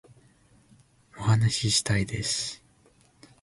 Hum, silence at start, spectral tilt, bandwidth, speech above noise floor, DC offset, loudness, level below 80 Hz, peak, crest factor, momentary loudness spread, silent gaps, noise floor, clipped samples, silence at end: none; 1.15 s; -3.5 dB/octave; 11.5 kHz; 35 dB; under 0.1%; -26 LUFS; -52 dBFS; -10 dBFS; 18 dB; 10 LU; none; -61 dBFS; under 0.1%; 0.85 s